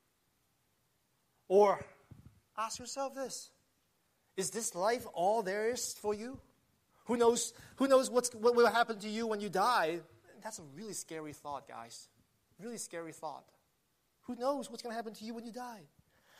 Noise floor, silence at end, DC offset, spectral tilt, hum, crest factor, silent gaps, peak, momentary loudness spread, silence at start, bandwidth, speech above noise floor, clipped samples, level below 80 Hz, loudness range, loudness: -78 dBFS; 0.55 s; under 0.1%; -3 dB/octave; none; 20 dB; none; -16 dBFS; 20 LU; 1.5 s; 15 kHz; 43 dB; under 0.1%; -76 dBFS; 14 LU; -34 LUFS